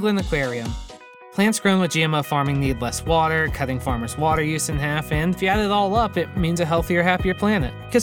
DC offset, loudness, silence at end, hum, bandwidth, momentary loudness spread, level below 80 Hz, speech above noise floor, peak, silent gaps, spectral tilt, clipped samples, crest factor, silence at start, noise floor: under 0.1%; -21 LUFS; 0 s; none; 18 kHz; 6 LU; -36 dBFS; 21 dB; -2 dBFS; none; -5 dB/octave; under 0.1%; 18 dB; 0 s; -42 dBFS